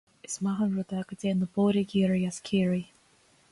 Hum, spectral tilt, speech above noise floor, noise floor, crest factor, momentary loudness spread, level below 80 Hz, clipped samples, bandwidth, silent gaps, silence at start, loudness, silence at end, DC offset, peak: none; -6.5 dB/octave; 36 dB; -63 dBFS; 14 dB; 8 LU; -62 dBFS; under 0.1%; 11.5 kHz; none; 0.3 s; -29 LUFS; 0.65 s; under 0.1%; -16 dBFS